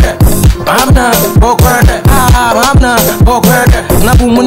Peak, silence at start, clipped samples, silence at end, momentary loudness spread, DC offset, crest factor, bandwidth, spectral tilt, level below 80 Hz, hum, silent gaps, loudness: 0 dBFS; 0 s; 4%; 0 s; 2 LU; 2%; 6 dB; 16.5 kHz; -5 dB/octave; -12 dBFS; none; none; -7 LUFS